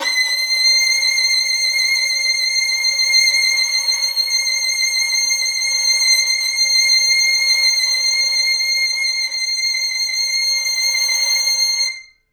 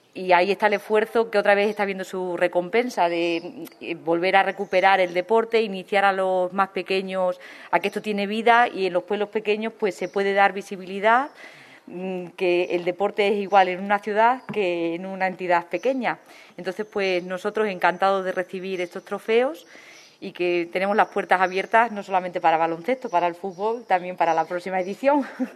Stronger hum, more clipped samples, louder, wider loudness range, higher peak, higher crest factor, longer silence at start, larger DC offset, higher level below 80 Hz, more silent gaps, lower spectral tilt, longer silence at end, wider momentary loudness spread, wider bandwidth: neither; neither; first, -14 LUFS vs -23 LUFS; about the same, 3 LU vs 3 LU; about the same, -4 dBFS vs -2 dBFS; second, 14 dB vs 22 dB; second, 0 s vs 0.15 s; neither; first, -64 dBFS vs -76 dBFS; neither; second, 6 dB/octave vs -5 dB/octave; first, 0.3 s vs 0 s; second, 5 LU vs 10 LU; first, over 20 kHz vs 13.5 kHz